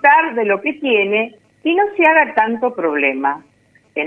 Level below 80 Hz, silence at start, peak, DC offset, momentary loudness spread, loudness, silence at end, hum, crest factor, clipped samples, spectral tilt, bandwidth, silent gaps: -66 dBFS; 0 s; 0 dBFS; under 0.1%; 11 LU; -16 LUFS; 0 s; 50 Hz at -65 dBFS; 16 dB; under 0.1%; -6.5 dB/octave; 4.6 kHz; none